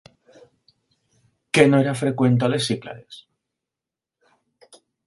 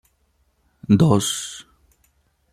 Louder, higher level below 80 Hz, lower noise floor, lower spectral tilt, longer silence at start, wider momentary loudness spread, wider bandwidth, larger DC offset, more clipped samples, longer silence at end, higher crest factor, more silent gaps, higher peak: about the same, -19 LUFS vs -19 LUFS; second, -62 dBFS vs -52 dBFS; first, -88 dBFS vs -65 dBFS; about the same, -6 dB/octave vs -5.5 dB/octave; first, 1.55 s vs 0.9 s; second, 16 LU vs 23 LU; second, 11.5 kHz vs 15 kHz; neither; neither; first, 1.85 s vs 0.9 s; about the same, 24 dB vs 20 dB; neither; about the same, 0 dBFS vs -2 dBFS